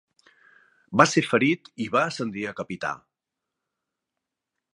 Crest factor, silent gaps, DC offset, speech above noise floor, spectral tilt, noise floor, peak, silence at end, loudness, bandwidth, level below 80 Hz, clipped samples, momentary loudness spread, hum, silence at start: 26 dB; none; under 0.1%; 62 dB; -4.5 dB/octave; -85 dBFS; 0 dBFS; 1.8 s; -24 LUFS; 11.5 kHz; -68 dBFS; under 0.1%; 13 LU; none; 0.9 s